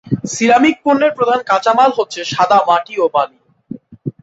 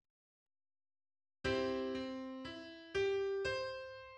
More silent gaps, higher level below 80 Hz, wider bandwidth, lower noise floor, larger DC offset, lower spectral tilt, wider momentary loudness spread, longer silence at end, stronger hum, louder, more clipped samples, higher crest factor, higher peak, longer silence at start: neither; first, -56 dBFS vs -64 dBFS; about the same, 8.2 kHz vs 9 kHz; second, -33 dBFS vs under -90 dBFS; neither; about the same, -4.5 dB/octave vs -5 dB/octave; first, 17 LU vs 11 LU; about the same, 0.1 s vs 0 s; neither; first, -14 LUFS vs -40 LUFS; neither; about the same, 14 dB vs 16 dB; first, -2 dBFS vs -26 dBFS; second, 0.05 s vs 1.45 s